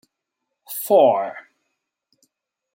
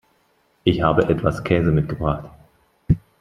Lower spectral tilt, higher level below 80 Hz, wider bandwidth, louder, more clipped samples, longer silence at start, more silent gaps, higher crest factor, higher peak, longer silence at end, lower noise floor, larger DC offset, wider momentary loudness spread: second, -4.5 dB/octave vs -8.5 dB/octave; second, -78 dBFS vs -38 dBFS; first, 16.5 kHz vs 11 kHz; first, -18 LUFS vs -21 LUFS; neither; about the same, 0.7 s vs 0.65 s; neither; about the same, 20 dB vs 20 dB; about the same, -4 dBFS vs -2 dBFS; first, 1.35 s vs 0.25 s; first, -80 dBFS vs -63 dBFS; neither; first, 18 LU vs 6 LU